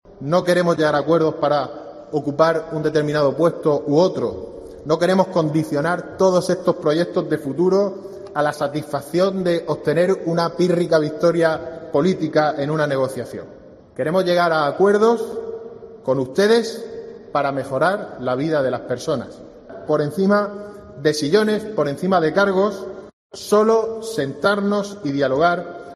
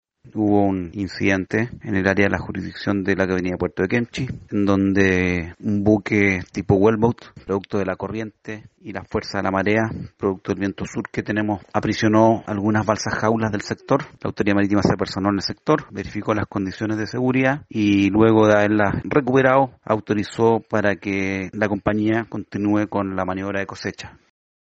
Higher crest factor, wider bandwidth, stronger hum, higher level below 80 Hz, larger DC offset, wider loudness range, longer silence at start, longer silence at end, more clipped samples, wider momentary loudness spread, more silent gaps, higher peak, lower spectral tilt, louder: about the same, 18 dB vs 20 dB; first, 13 kHz vs 8 kHz; neither; second, -56 dBFS vs -48 dBFS; neither; second, 2 LU vs 6 LU; second, 0.1 s vs 0.25 s; second, 0 s vs 0.65 s; neither; about the same, 13 LU vs 11 LU; first, 23.13-23.30 s vs none; about the same, -2 dBFS vs -2 dBFS; about the same, -6 dB/octave vs -6.5 dB/octave; about the same, -19 LUFS vs -21 LUFS